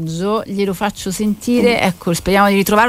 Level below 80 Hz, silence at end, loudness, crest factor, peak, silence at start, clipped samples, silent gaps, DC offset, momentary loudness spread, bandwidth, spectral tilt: -40 dBFS; 0 s; -16 LUFS; 16 dB; 0 dBFS; 0 s; under 0.1%; none; under 0.1%; 8 LU; 16.5 kHz; -5 dB/octave